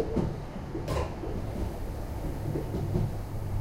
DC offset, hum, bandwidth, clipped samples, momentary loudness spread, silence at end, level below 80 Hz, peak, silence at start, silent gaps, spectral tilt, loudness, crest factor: under 0.1%; none; 16 kHz; under 0.1%; 6 LU; 0 s; -38 dBFS; -14 dBFS; 0 s; none; -7.5 dB/octave; -34 LUFS; 18 dB